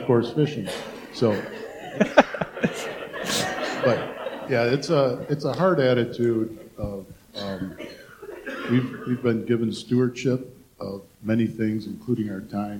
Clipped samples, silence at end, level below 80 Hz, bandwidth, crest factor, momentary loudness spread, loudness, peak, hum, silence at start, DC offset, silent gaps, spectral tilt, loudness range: under 0.1%; 0 s; -56 dBFS; 18 kHz; 22 dB; 15 LU; -25 LUFS; -2 dBFS; none; 0 s; under 0.1%; none; -6 dB/octave; 5 LU